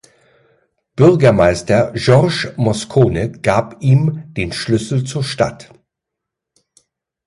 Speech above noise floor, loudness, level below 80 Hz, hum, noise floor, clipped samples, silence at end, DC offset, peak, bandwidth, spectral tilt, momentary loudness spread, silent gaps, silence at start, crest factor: 67 dB; -15 LUFS; -40 dBFS; none; -81 dBFS; under 0.1%; 1.65 s; under 0.1%; 0 dBFS; 11.5 kHz; -6.5 dB/octave; 9 LU; none; 0.95 s; 16 dB